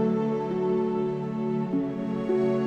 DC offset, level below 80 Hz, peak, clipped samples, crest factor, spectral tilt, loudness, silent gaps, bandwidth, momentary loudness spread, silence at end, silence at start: under 0.1%; -64 dBFS; -14 dBFS; under 0.1%; 12 dB; -9.5 dB/octave; -27 LUFS; none; 7.6 kHz; 4 LU; 0 s; 0 s